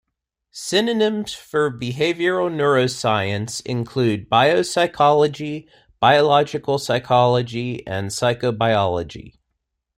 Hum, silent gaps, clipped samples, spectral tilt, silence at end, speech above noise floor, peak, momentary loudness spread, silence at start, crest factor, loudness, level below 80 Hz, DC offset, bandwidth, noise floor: none; none; under 0.1%; -5 dB/octave; 0.65 s; 59 dB; -2 dBFS; 11 LU; 0.55 s; 18 dB; -19 LUFS; -54 dBFS; under 0.1%; 16 kHz; -78 dBFS